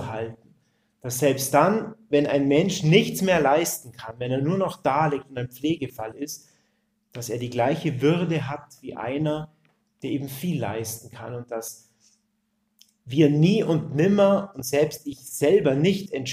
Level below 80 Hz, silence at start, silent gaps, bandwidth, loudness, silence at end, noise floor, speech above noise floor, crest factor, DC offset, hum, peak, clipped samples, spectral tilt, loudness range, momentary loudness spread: -60 dBFS; 0 s; none; 16 kHz; -23 LUFS; 0 s; -73 dBFS; 49 dB; 20 dB; under 0.1%; none; -4 dBFS; under 0.1%; -5.5 dB/octave; 9 LU; 16 LU